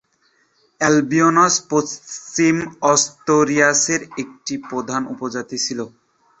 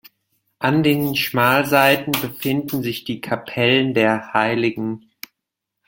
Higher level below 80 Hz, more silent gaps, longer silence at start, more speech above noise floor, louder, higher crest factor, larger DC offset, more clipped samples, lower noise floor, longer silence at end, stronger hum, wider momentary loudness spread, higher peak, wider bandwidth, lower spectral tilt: about the same, -60 dBFS vs -58 dBFS; neither; first, 0.8 s vs 0.6 s; second, 43 dB vs 63 dB; about the same, -18 LUFS vs -19 LUFS; about the same, 18 dB vs 20 dB; neither; neither; second, -62 dBFS vs -81 dBFS; second, 0.5 s vs 0.9 s; neither; about the same, 14 LU vs 13 LU; about the same, -2 dBFS vs 0 dBFS; second, 8.2 kHz vs 17 kHz; second, -3 dB/octave vs -5 dB/octave